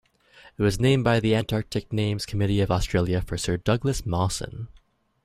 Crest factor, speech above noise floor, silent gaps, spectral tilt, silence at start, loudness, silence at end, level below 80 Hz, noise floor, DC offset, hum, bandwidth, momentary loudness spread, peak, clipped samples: 18 dB; 30 dB; none; -6 dB/octave; 0.45 s; -25 LUFS; 0.45 s; -40 dBFS; -54 dBFS; under 0.1%; none; 15 kHz; 8 LU; -6 dBFS; under 0.1%